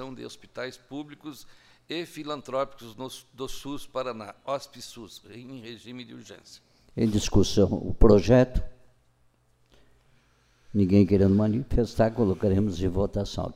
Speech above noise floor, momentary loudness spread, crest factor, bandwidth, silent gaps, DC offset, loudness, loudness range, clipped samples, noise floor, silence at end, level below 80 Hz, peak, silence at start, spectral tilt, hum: 40 dB; 21 LU; 24 dB; 15 kHz; none; under 0.1%; -25 LUFS; 13 LU; under 0.1%; -65 dBFS; 0 s; -36 dBFS; -2 dBFS; 0 s; -7 dB/octave; none